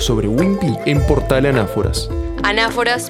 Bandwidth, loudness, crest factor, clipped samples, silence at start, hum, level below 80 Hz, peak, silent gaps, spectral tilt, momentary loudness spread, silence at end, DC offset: 17 kHz; -16 LUFS; 16 dB; under 0.1%; 0 s; none; -26 dBFS; 0 dBFS; none; -5.5 dB/octave; 5 LU; 0 s; under 0.1%